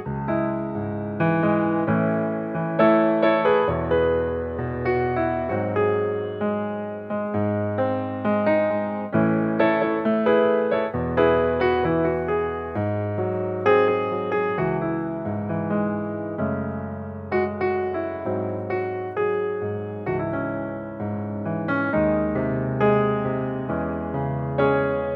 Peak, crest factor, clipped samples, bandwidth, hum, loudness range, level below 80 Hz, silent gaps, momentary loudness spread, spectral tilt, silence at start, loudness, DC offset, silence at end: -6 dBFS; 18 dB; under 0.1%; 5.6 kHz; none; 5 LU; -48 dBFS; none; 9 LU; -10 dB/octave; 0 s; -23 LUFS; under 0.1%; 0 s